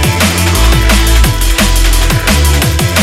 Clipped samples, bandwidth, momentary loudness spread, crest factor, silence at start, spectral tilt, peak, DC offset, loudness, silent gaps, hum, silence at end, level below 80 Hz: under 0.1%; 16.5 kHz; 2 LU; 8 dB; 0 s; -4 dB/octave; 0 dBFS; under 0.1%; -9 LUFS; none; none; 0 s; -10 dBFS